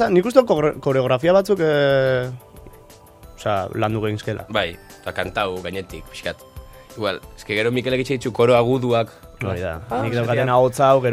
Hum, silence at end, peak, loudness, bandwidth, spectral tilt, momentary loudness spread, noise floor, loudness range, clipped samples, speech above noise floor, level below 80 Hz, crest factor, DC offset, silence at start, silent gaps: none; 0 s; 0 dBFS; -20 LUFS; 15.5 kHz; -6 dB/octave; 14 LU; -45 dBFS; 7 LU; under 0.1%; 26 dB; -48 dBFS; 20 dB; under 0.1%; 0 s; none